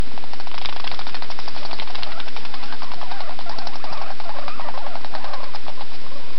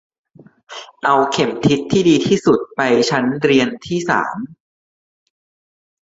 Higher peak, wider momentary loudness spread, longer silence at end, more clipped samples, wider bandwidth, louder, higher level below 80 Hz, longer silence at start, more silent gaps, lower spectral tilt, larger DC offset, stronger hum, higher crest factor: about the same, -2 dBFS vs 0 dBFS; second, 5 LU vs 16 LU; second, 0 s vs 1.6 s; neither; second, 6.4 kHz vs 8 kHz; second, -33 LUFS vs -16 LUFS; about the same, -52 dBFS vs -54 dBFS; second, 0 s vs 0.7 s; neither; second, -2.5 dB/octave vs -5 dB/octave; first, 40% vs under 0.1%; neither; first, 26 dB vs 16 dB